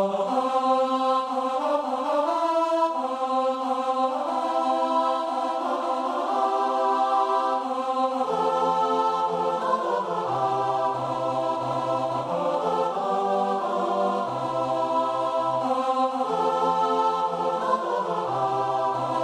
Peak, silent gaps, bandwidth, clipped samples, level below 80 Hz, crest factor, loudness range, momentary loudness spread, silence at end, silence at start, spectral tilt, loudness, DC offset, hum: -10 dBFS; none; 12.5 kHz; under 0.1%; -70 dBFS; 14 dB; 2 LU; 4 LU; 0 s; 0 s; -5.5 dB/octave; -25 LUFS; under 0.1%; none